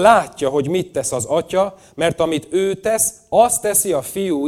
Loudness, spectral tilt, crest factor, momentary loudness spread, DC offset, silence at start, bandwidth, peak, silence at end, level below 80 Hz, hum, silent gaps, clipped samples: -18 LUFS; -3.5 dB/octave; 18 dB; 7 LU; under 0.1%; 0 s; 18 kHz; 0 dBFS; 0 s; -50 dBFS; none; none; under 0.1%